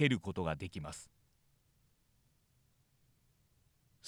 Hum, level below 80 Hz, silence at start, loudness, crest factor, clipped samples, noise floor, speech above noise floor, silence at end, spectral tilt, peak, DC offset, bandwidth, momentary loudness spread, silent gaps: none; -64 dBFS; 0 s; -39 LUFS; 26 dB; under 0.1%; -74 dBFS; 37 dB; 0 s; -5.5 dB/octave; -16 dBFS; under 0.1%; 15 kHz; 14 LU; none